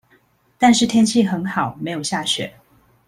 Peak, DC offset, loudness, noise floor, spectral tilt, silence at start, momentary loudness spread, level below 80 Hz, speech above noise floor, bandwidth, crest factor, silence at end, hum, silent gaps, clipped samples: -2 dBFS; under 0.1%; -18 LUFS; -58 dBFS; -4 dB/octave; 0.6 s; 9 LU; -56 dBFS; 40 dB; 14 kHz; 18 dB; 0.55 s; none; none; under 0.1%